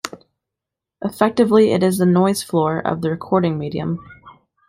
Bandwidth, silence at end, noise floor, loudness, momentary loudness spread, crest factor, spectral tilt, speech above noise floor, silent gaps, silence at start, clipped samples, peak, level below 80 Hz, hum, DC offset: 16 kHz; 0.4 s; -85 dBFS; -18 LUFS; 14 LU; 16 dB; -6.5 dB/octave; 67 dB; none; 0.05 s; under 0.1%; -2 dBFS; -56 dBFS; none; under 0.1%